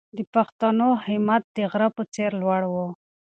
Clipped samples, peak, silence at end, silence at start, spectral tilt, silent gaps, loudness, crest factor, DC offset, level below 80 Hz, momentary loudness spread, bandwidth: under 0.1%; -6 dBFS; 0.3 s; 0.15 s; -7 dB/octave; 0.27-0.33 s, 0.52-0.59 s, 1.44-1.55 s, 2.08-2.12 s; -23 LUFS; 18 dB; under 0.1%; -68 dBFS; 6 LU; 8.6 kHz